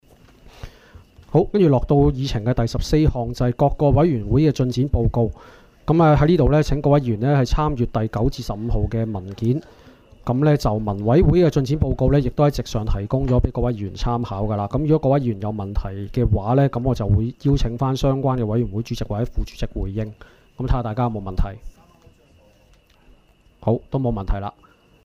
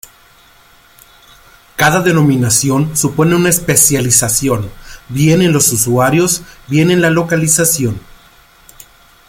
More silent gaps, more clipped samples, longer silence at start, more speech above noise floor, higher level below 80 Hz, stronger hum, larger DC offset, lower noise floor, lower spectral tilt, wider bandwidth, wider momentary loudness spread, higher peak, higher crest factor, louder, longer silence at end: neither; neither; second, 0.45 s vs 1.8 s; about the same, 35 dB vs 34 dB; first, -30 dBFS vs -40 dBFS; neither; neither; first, -54 dBFS vs -45 dBFS; first, -8 dB/octave vs -4 dB/octave; second, 13 kHz vs over 20 kHz; about the same, 11 LU vs 9 LU; second, -4 dBFS vs 0 dBFS; about the same, 16 dB vs 14 dB; second, -20 LUFS vs -11 LUFS; second, 0.55 s vs 1.3 s